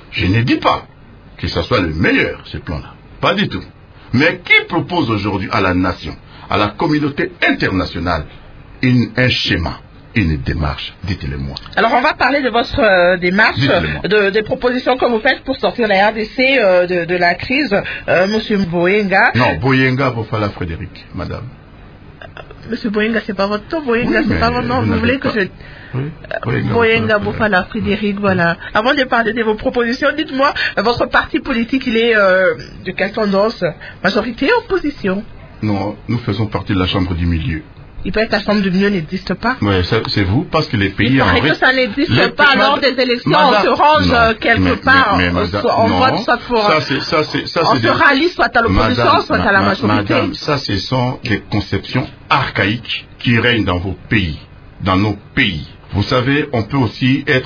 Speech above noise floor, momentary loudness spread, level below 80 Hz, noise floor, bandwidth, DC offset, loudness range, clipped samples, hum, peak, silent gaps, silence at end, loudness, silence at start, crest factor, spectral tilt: 23 dB; 11 LU; -34 dBFS; -38 dBFS; 5.4 kHz; under 0.1%; 6 LU; under 0.1%; none; 0 dBFS; none; 0 s; -14 LUFS; 0.1 s; 14 dB; -6.5 dB/octave